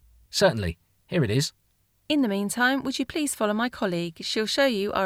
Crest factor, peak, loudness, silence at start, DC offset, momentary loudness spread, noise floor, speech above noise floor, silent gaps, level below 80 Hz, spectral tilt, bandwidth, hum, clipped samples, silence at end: 18 dB; -8 dBFS; -25 LUFS; 0.35 s; under 0.1%; 8 LU; -59 dBFS; 34 dB; none; -52 dBFS; -4.5 dB/octave; 16.5 kHz; none; under 0.1%; 0 s